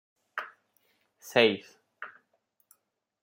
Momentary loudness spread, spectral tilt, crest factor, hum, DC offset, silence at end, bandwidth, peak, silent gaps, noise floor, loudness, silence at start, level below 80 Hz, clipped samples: 22 LU; -4 dB/octave; 28 dB; none; under 0.1%; 1.15 s; 16.5 kHz; -6 dBFS; none; -74 dBFS; -28 LUFS; 0.35 s; -82 dBFS; under 0.1%